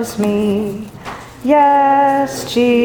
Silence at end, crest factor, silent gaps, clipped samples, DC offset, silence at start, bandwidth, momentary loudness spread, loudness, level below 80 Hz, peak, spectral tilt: 0 s; 14 dB; none; under 0.1%; under 0.1%; 0 s; over 20 kHz; 18 LU; -14 LUFS; -48 dBFS; 0 dBFS; -5.5 dB/octave